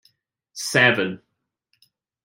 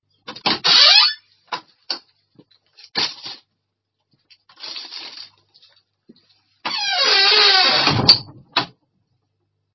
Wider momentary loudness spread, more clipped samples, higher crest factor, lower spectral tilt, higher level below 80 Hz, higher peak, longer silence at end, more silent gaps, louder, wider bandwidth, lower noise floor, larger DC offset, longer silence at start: about the same, 23 LU vs 22 LU; neither; about the same, 22 dB vs 20 dB; first, -3.5 dB/octave vs -2 dB/octave; second, -70 dBFS vs -54 dBFS; about the same, -2 dBFS vs 0 dBFS; about the same, 1.05 s vs 1.1 s; neither; second, -19 LUFS vs -13 LUFS; first, 16.5 kHz vs 7.6 kHz; second, -72 dBFS vs -76 dBFS; neither; first, 0.55 s vs 0.3 s